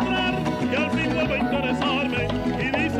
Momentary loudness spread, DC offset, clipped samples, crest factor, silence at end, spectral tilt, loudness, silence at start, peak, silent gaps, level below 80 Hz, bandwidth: 2 LU; under 0.1%; under 0.1%; 12 dB; 0 s; -6 dB/octave; -23 LUFS; 0 s; -10 dBFS; none; -42 dBFS; 13 kHz